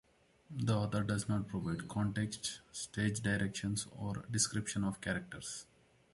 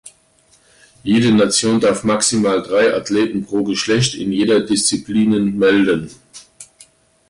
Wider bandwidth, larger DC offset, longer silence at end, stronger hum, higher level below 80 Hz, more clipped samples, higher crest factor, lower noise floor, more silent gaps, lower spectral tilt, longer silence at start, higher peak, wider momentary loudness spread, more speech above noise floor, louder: about the same, 11.5 kHz vs 11.5 kHz; neither; second, 0.5 s vs 0.65 s; neither; second, -60 dBFS vs -52 dBFS; neither; about the same, 18 dB vs 14 dB; first, -59 dBFS vs -54 dBFS; neither; about the same, -4.5 dB/octave vs -4 dB/octave; first, 0.5 s vs 0.05 s; second, -20 dBFS vs -4 dBFS; first, 10 LU vs 6 LU; second, 22 dB vs 39 dB; second, -37 LUFS vs -15 LUFS